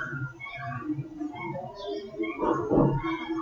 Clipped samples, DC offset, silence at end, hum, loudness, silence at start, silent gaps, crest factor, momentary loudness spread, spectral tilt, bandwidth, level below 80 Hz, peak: under 0.1%; under 0.1%; 0 s; none; -30 LUFS; 0 s; none; 20 dB; 13 LU; -8.5 dB/octave; 7 kHz; -48 dBFS; -10 dBFS